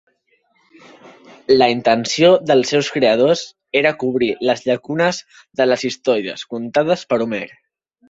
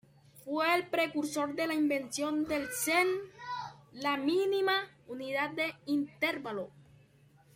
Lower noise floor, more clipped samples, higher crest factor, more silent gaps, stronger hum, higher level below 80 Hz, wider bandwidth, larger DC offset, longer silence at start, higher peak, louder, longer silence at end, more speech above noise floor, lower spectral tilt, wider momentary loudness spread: about the same, -62 dBFS vs -63 dBFS; neither; about the same, 16 dB vs 20 dB; neither; neither; first, -58 dBFS vs -72 dBFS; second, 8 kHz vs 16.5 kHz; neither; first, 1.05 s vs 0.35 s; first, -2 dBFS vs -14 dBFS; first, -17 LUFS vs -32 LUFS; about the same, 0.65 s vs 0.75 s; first, 46 dB vs 31 dB; first, -4.5 dB/octave vs -3 dB/octave; about the same, 12 LU vs 12 LU